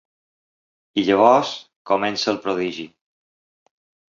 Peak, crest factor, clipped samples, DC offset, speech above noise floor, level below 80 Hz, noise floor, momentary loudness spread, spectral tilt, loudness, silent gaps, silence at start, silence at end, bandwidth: 0 dBFS; 22 dB; under 0.1%; under 0.1%; over 71 dB; -64 dBFS; under -90 dBFS; 18 LU; -4.5 dB/octave; -20 LUFS; 1.76-1.85 s; 0.95 s; 1.25 s; 7.6 kHz